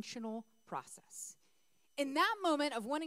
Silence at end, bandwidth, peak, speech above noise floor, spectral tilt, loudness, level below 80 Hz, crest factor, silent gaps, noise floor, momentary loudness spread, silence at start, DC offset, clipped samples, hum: 0 s; 16 kHz; -20 dBFS; 40 dB; -2.5 dB/octave; -37 LUFS; under -90 dBFS; 20 dB; none; -78 dBFS; 16 LU; 0 s; under 0.1%; under 0.1%; none